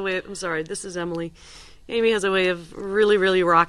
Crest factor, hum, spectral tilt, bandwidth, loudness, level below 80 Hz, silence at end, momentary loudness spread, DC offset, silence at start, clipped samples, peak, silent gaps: 20 dB; none; -4.5 dB/octave; 11.5 kHz; -22 LUFS; -52 dBFS; 0 s; 12 LU; under 0.1%; 0 s; under 0.1%; -4 dBFS; none